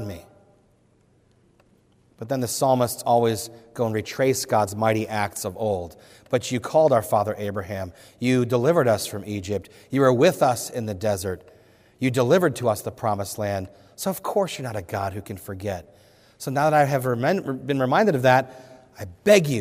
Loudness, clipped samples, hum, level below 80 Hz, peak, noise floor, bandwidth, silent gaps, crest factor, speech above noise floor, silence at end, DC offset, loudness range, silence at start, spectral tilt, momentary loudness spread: -23 LUFS; under 0.1%; none; -62 dBFS; -4 dBFS; -61 dBFS; 16 kHz; none; 20 dB; 38 dB; 0 s; under 0.1%; 4 LU; 0 s; -5.5 dB/octave; 14 LU